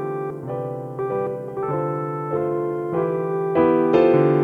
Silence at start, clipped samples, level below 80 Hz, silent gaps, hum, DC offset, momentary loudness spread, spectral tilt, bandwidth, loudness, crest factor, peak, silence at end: 0 s; under 0.1%; -58 dBFS; none; none; under 0.1%; 12 LU; -9.5 dB/octave; 5 kHz; -22 LUFS; 18 dB; -4 dBFS; 0 s